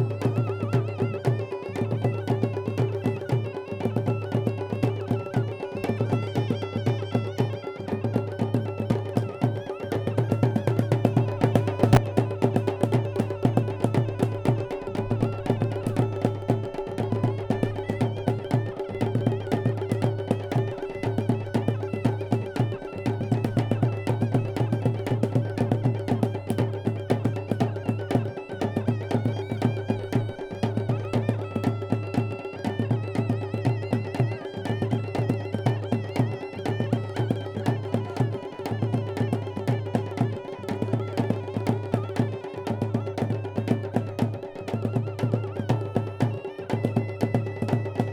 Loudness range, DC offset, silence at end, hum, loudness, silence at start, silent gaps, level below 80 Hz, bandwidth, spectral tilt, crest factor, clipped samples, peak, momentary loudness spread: 4 LU; under 0.1%; 0 s; none; -27 LUFS; 0 s; none; -52 dBFS; 12.5 kHz; -8 dB/octave; 24 dB; under 0.1%; -2 dBFS; 5 LU